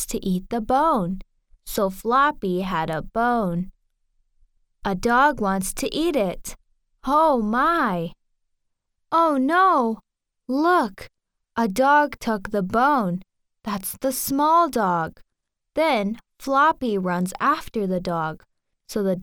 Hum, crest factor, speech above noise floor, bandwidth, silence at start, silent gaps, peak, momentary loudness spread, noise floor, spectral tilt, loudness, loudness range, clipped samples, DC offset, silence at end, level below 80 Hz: none; 16 dB; 57 dB; 19.5 kHz; 0 s; none; -6 dBFS; 13 LU; -79 dBFS; -5 dB/octave; -22 LUFS; 3 LU; under 0.1%; under 0.1%; 0 s; -46 dBFS